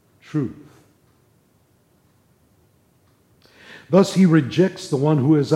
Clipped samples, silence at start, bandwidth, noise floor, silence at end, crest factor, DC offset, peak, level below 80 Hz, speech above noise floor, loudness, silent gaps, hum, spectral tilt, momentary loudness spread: under 0.1%; 0.35 s; 12.5 kHz; -60 dBFS; 0 s; 18 dB; under 0.1%; -4 dBFS; -64 dBFS; 43 dB; -19 LUFS; none; none; -7.5 dB/octave; 11 LU